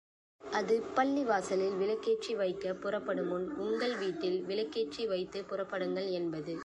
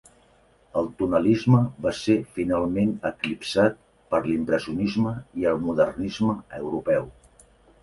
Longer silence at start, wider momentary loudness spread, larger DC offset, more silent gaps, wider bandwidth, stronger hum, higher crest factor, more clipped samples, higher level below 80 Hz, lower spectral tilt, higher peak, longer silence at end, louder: second, 0.4 s vs 0.75 s; about the same, 6 LU vs 8 LU; neither; neither; about the same, 11 kHz vs 11.5 kHz; neither; about the same, 18 dB vs 20 dB; neither; second, -72 dBFS vs -52 dBFS; second, -5 dB/octave vs -7 dB/octave; second, -16 dBFS vs -6 dBFS; second, 0 s vs 0.7 s; second, -34 LUFS vs -24 LUFS